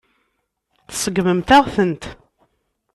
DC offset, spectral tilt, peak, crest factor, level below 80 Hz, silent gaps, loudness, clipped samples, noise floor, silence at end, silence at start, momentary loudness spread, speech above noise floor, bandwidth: under 0.1%; -4.5 dB/octave; -2 dBFS; 18 dB; -44 dBFS; none; -17 LUFS; under 0.1%; -71 dBFS; 0.8 s; 0.9 s; 17 LU; 56 dB; 13.5 kHz